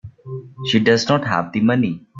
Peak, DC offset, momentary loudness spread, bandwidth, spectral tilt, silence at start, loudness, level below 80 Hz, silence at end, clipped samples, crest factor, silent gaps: -2 dBFS; under 0.1%; 18 LU; 7.6 kHz; -5.5 dB/octave; 0.05 s; -18 LUFS; -56 dBFS; 0 s; under 0.1%; 16 dB; none